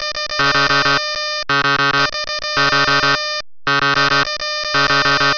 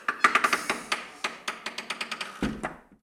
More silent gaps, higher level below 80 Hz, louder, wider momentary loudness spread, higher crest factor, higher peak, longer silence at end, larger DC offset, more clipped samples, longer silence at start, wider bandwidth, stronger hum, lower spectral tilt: neither; first, -44 dBFS vs -54 dBFS; first, -14 LUFS vs -29 LUFS; second, 6 LU vs 13 LU; second, 12 dB vs 28 dB; about the same, -4 dBFS vs -2 dBFS; about the same, 0 s vs 0.1 s; neither; neither; about the same, 0 s vs 0 s; second, 5.4 kHz vs 18.5 kHz; neither; about the same, -2.5 dB/octave vs -2 dB/octave